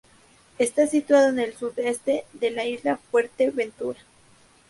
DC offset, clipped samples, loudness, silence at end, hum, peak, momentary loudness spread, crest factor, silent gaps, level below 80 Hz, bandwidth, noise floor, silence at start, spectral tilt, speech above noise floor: under 0.1%; under 0.1%; -24 LUFS; 0.75 s; none; -6 dBFS; 10 LU; 18 dB; none; -66 dBFS; 12 kHz; -56 dBFS; 0.6 s; -3.5 dB/octave; 33 dB